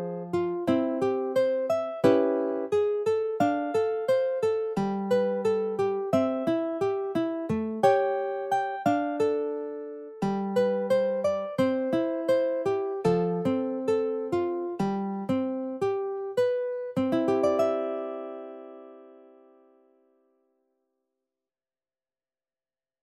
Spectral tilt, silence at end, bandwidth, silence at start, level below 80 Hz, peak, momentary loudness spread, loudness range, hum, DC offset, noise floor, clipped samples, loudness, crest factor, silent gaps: -7 dB/octave; 3.85 s; 13 kHz; 0 s; -66 dBFS; -10 dBFS; 6 LU; 3 LU; none; under 0.1%; under -90 dBFS; under 0.1%; -27 LUFS; 18 dB; none